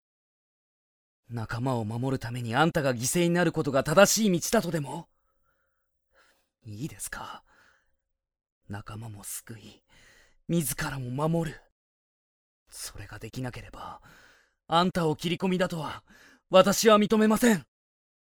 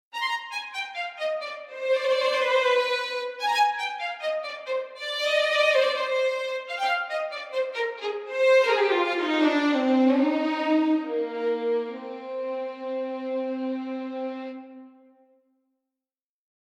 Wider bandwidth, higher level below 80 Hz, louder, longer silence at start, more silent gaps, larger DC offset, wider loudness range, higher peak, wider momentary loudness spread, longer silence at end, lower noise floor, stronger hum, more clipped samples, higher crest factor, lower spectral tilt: first, over 20 kHz vs 14 kHz; first, -56 dBFS vs -86 dBFS; about the same, -26 LUFS vs -25 LUFS; first, 1.3 s vs 0.15 s; first, 8.52-8.61 s, 11.72-12.66 s vs none; neither; first, 18 LU vs 10 LU; first, -6 dBFS vs -10 dBFS; first, 22 LU vs 12 LU; second, 0.75 s vs 1.8 s; second, -76 dBFS vs under -90 dBFS; neither; neither; first, 24 dB vs 16 dB; first, -4.5 dB/octave vs -2 dB/octave